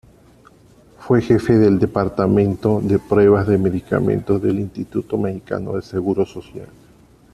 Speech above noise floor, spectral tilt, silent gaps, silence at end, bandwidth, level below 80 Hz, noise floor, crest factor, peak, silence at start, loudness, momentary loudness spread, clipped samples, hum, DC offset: 32 dB; -9 dB/octave; none; 0.7 s; 12 kHz; -46 dBFS; -49 dBFS; 18 dB; -2 dBFS; 1 s; -18 LUFS; 11 LU; under 0.1%; none; under 0.1%